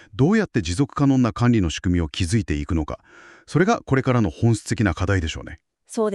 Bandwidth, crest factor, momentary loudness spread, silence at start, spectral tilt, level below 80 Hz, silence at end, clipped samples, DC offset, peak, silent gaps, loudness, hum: 12 kHz; 16 dB; 10 LU; 0.15 s; -6.5 dB/octave; -36 dBFS; 0 s; under 0.1%; under 0.1%; -4 dBFS; none; -21 LUFS; none